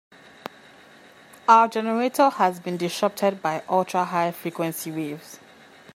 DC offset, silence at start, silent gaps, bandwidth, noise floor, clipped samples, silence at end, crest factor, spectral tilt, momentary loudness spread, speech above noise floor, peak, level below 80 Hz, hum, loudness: under 0.1%; 1.5 s; none; 16 kHz; -50 dBFS; under 0.1%; 0.6 s; 22 dB; -5 dB/octave; 23 LU; 27 dB; -2 dBFS; -76 dBFS; none; -23 LUFS